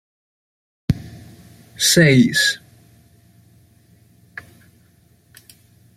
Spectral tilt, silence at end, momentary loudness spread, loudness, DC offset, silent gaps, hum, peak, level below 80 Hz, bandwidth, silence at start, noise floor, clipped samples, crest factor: -4 dB/octave; 3.4 s; 27 LU; -16 LUFS; under 0.1%; none; none; -2 dBFS; -48 dBFS; 15.5 kHz; 0.9 s; -55 dBFS; under 0.1%; 20 dB